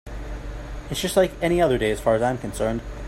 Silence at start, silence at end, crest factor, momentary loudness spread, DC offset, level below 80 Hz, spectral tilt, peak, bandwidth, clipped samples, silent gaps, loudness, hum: 0.05 s; 0 s; 18 dB; 15 LU; under 0.1%; -36 dBFS; -5 dB/octave; -4 dBFS; 16 kHz; under 0.1%; none; -22 LUFS; none